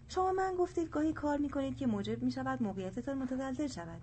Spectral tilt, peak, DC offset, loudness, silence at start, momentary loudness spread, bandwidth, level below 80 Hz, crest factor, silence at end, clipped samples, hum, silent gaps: -6.5 dB/octave; -22 dBFS; under 0.1%; -36 LUFS; 0 s; 6 LU; 8.8 kHz; -56 dBFS; 14 dB; 0 s; under 0.1%; none; none